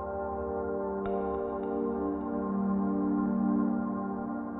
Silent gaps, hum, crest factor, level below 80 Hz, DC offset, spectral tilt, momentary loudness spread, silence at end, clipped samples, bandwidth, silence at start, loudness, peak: none; none; 12 dB; -52 dBFS; under 0.1%; -12.5 dB/octave; 6 LU; 0 s; under 0.1%; 3.9 kHz; 0 s; -32 LUFS; -18 dBFS